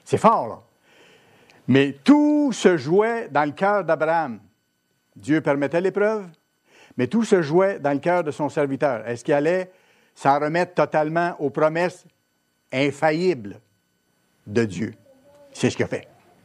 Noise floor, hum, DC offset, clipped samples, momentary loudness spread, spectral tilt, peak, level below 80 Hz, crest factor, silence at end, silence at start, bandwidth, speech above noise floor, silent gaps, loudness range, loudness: -70 dBFS; none; under 0.1%; under 0.1%; 12 LU; -6 dB/octave; 0 dBFS; -70 dBFS; 22 dB; 0.4 s; 0.05 s; 11.5 kHz; 49 dB; none; 6 LU; -21 LUFS